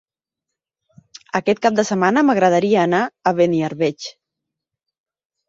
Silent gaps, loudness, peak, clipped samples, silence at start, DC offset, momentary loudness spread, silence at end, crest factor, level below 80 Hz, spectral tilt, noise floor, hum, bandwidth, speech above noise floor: none; -17 LUFS; -2 dBFS; under 0.1%; 1.35 s; under 0.1%; 8 LU; 1.35 s; 18 dB; -64 dBFS; -5.5 dB/octave; -83 dBFS; none; 8 kHz; 67 dB